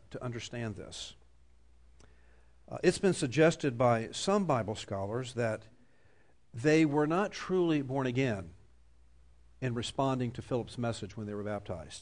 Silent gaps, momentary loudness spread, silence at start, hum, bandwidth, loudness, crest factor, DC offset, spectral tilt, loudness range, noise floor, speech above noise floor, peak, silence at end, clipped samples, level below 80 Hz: none; 14 LU; 0.1 s; none; 10.5 kHz; -32 LUFS; 18 dB; under 0.1%; -6 dB/octave; 6 LU; -67 dBFS; 35 dB; -14 dBFS; 0 s; under 0.1%; -60 dBFS